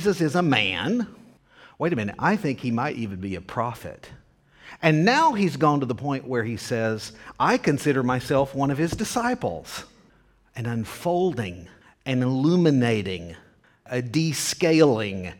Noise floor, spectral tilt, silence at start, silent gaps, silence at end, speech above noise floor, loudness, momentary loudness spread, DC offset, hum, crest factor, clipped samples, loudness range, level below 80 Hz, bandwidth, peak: -59 dBFS; -5.5 dB/octave; 0 s; none; 0.05 s; 35 dB; -24 LUFS; 14 LU; under 0.1%; none; 20 dB; under 0.1%; 5 LU; -54 dBFS; 18 kHz; -4 dBFS